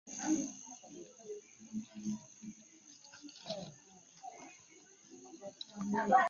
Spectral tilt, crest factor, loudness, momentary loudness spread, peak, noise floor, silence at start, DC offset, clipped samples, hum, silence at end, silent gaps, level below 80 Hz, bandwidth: -3.5 dB/octave; 26 dB; -42 LUFS; 21 LU; -14 dBFS; -61 dBFS; 0.05 s; under 0.1%; under 0.1%; none; 0 s; none; -80 dBFS; 7.2 kHz